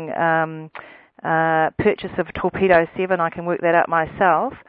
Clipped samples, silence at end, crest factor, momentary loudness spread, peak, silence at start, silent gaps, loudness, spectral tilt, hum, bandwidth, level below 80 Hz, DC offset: under 0.1%; 0.1 s; 18 dB; 10 LU; 0 dBFS; 0 s; none; -19 LUFS; -10.5 dB/octave; none; 4.9 kHz; -50 dBFS; under 0.1%